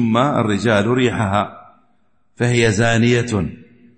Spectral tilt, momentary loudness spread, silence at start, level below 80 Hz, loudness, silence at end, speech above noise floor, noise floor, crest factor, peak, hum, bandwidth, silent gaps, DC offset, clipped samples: -6 dB/octave; 7 LU; 0 s; -46 dBFS; -17 LUFS; 0.4 s; 48 dB; -64 dBFS; 14 dB; -2 dBFS; none; 8.8 kHz; none; under 0.1%; under 0.1%